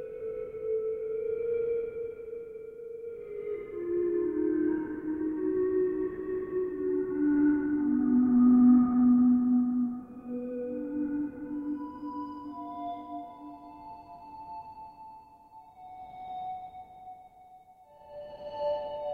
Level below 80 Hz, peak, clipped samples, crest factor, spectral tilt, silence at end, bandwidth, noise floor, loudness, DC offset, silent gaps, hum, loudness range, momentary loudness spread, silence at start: -62 dBFS; -12 dBFS; under 0.1%; 18 dB; -9.5 dB/octave; 0 s; 4.6 kHz; -55 dBFS; -29 LUFS; under 0.1%; none; none; 20 LU; 24 LU; 0 s